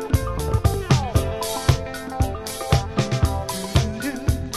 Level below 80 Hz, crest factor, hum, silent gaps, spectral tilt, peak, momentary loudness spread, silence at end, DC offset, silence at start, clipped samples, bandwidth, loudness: -28 dBFS; 20 dB; none; none; -5.5 dB/octave; -2 dBFS; 6 LU; 0 s; under 0.1%; 0 s; under 0.1%; 13.5 kHz; -23 LUFS